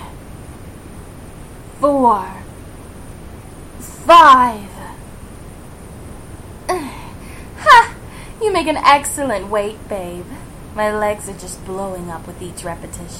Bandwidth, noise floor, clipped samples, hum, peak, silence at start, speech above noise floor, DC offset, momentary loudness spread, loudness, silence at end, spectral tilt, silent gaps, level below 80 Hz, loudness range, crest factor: 16.5 kHz; -34 dBFS; under 0.1%; none; 0 dBFS; 0 s; 19 dB; under 0.1%; 27 LU; -14 LUFS; 0 s; -3.5 dB/octave; none; -38 dBFS; 10 LU; 18 dB